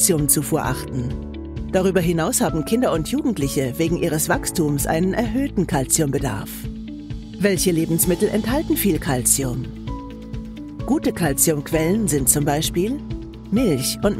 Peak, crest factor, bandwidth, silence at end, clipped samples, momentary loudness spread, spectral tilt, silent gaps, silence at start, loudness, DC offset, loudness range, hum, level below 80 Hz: 0 dBFS; 20 dB; 16 kHz; 0 s; under 0.1%; 15 LU; -4.5 dB/octave; none; 0 s; -20 LUFS; under 0.1%; 2 LU; none; -36 dBFS